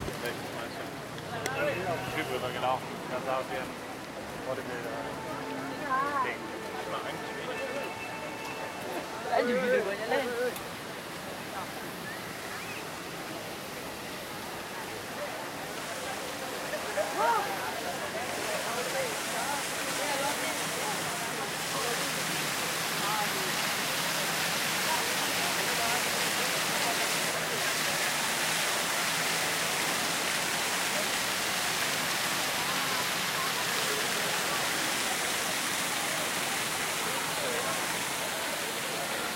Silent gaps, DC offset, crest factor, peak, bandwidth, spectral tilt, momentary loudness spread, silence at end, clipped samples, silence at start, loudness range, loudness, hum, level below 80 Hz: none; under 0.1%; 18 dB; -14 dBFS; 16 kHz; -1.5 dB/octave; 10 LU; 0 s; under 0.1%; 0 s; 9 LU; -30 LUFS; none; -64 dBFS